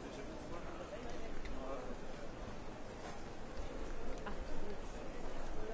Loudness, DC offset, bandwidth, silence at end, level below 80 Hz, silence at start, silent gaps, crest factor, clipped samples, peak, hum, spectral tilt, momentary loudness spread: -48 LUFS; under 0.1%; 8 kHz; 0 s; -50 dBFS; 0 s; none; 14 dB; under 0.1%; -26 dBFS; none; -5.5 dB/octave; 3 LU